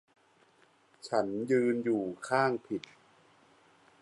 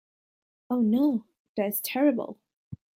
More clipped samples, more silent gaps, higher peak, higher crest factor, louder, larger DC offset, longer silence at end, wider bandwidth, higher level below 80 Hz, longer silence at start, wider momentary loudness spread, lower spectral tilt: neither; second, none vs 1.40-1.55 s, 2.56-2.71 s; about the same, -14 dBFS vs -12 dBFS; about the same, 20 dB vs 16 dB; second, -31 LUFS vs -27 LUFS; neither; first, 1.25 s vs 0.2 s; second, 11.5 kHz vs 16.5 kHz; second, -78 dBFS vs -72 dBFS; first, 1.05 s vs 0.7 s; second, 12 LU vs 17 LU; about the same, -6 dB/octave vs -5.5 dB/octave